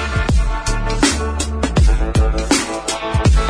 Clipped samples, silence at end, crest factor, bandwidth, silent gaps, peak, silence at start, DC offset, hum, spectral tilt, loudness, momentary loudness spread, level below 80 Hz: under 0.1%; 0 s; 16 dB; 10.5 kHz; none; 0 dBFS; 0 s; under 0.1%; none; -4.5 dB/octave; -17 LUFS; 5 LU; -18 dBFS